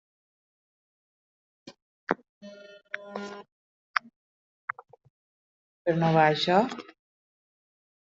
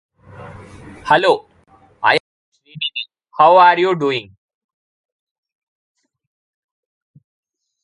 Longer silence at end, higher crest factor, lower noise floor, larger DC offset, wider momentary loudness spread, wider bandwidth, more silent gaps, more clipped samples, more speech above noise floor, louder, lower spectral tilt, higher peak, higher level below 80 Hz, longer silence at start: second, 1.25 s vs 3.6 s; first, 28 dB vs 20 dB; about the same, -48 dBFS vs -51 dBFS; neither; first, 25 LU vs 20 LU; second, 7.6 kHz vs 11 kHz; first, 1.82-2.07 s, 2.29-2.41 s, 3.52-3.94 s, 4.16-4.68 s, 5.10-5.85 s vs 2.20-2.52 s; neither; second, 24 dB vs 38 dB; second, -27 LUFS vs -15 LUFS; about the same, -4 dB/octave vs -5 dB/octave; second, -4 dBFS vs 0 dBFS; second, -74 dBFS vs -58 dBFS; first, 1.65 s vs 0.4 s